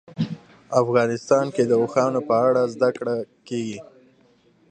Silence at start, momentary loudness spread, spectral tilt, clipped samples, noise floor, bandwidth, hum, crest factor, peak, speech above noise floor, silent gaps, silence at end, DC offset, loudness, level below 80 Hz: 0.1 s; 11 LU; -6.5 dB/octave; under 0.1%; -58 dBFS; 9.4 kHz; none; 18 dB; -4 dBFS; 38 dB; none; 0.9 s; under 0.1%; -22 LUFS; -68 dBFS